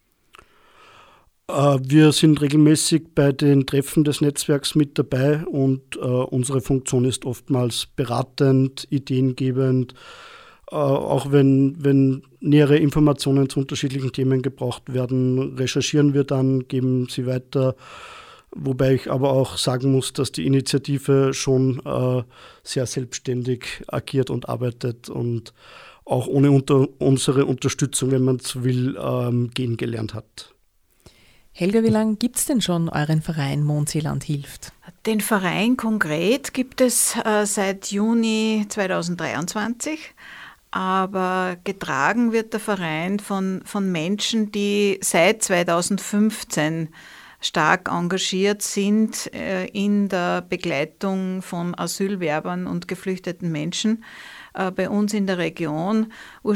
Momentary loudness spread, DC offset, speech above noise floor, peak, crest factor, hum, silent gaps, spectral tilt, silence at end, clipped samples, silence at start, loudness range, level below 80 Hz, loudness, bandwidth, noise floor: 11 LU; under 0.1%; 40 dB; 0 dBFS; 20 dB; none; none; -5.5 dB/octave; 0 s; under 0.1%; 1.5 s; 6 LU; -52 dBFS; -21 LUFS; 16.5 kHz; -61 dBFS